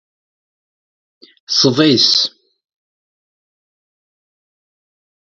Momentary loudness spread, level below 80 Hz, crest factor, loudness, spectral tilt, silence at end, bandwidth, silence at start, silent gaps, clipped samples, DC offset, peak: 7 LU; -64 dBFS; 20 dB; -12 LUFS; -3.5 dB/octave; 3.1 s; 7.8 kHz; 1.5 s; none; under 0.1%; under 0.1%; 0 dBFS